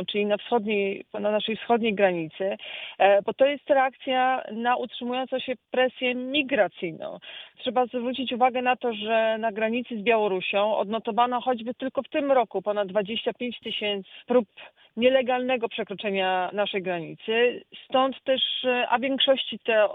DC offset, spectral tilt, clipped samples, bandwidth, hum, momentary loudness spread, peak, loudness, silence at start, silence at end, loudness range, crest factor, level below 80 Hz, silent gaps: under 0.1%; -7.5 dB/octave; under 0.1%; 4.1 kHz; none; 8 LU; -8 dBFS; -25 LUFS; 0 s; 0 s; 3 LU; 18 dB; -72 dBFS; none